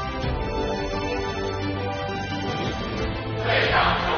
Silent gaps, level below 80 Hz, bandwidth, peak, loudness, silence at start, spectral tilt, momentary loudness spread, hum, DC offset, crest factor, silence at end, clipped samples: none; -36 dBFS; 6.6 kHz; -8 dBFS; -25 LUFS; 0 s; -3.5 dB/octave; 8 LU; none; under 0.1%; 16 dB; 0 s; under 0.1%